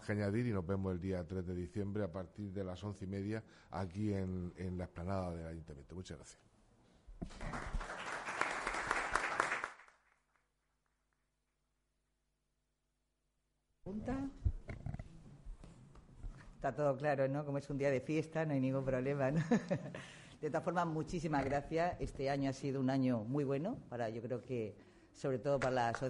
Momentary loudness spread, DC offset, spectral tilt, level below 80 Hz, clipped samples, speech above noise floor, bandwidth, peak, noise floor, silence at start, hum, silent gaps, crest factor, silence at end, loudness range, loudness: 15 LU; under 0.1%; -6.5 dB/octave; -56 dBFS; under 0.1%; 46 dB; 11.5 kHz; -14 dBFS; -84 dBFS; 0 s; none; none; 26 dB; 0 s; 10 LU; -39 LUFS